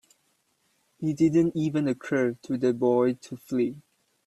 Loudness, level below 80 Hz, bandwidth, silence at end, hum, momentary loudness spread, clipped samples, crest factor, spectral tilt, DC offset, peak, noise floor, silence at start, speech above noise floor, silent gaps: -26 LUFS; -66 dBFS; 12.5 kHz; 0.45 s; none; 9 LU; under 0.1%; 16 dB; -7.5 dB/octave; under 0.1%; -10 dBFS; -71 dBFS; 1 s; 46 dB; none